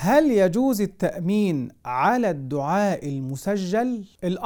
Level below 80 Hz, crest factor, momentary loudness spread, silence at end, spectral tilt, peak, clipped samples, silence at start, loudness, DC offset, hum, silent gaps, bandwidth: -54 dBFS; 16 dB; 9 LU; 0 s; -6.5 dB/octave; -6 dBFS; under 0.1%; 0 s; -23 LUFS; under 0.1%; none; none; 19 kHz